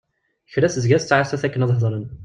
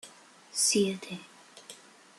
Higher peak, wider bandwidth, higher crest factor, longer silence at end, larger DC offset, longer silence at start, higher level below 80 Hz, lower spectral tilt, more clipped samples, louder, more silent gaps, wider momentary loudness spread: first, -2 dBFS vs -14 dBFS; second, 9 kHz vs 13 kHz; about the same, 18 dB vs 20 dB; second, 0 s vs 0.45 s; neither; first, 0.5 s vs 0.05 s; first, -52 dBFS vs -76 dBFS; first, -6 dB/octave vs -2.5 dB/octave; neither; first, -20 LUFS vs -28 LUFS; neither; second, 6 LU vs 26 LU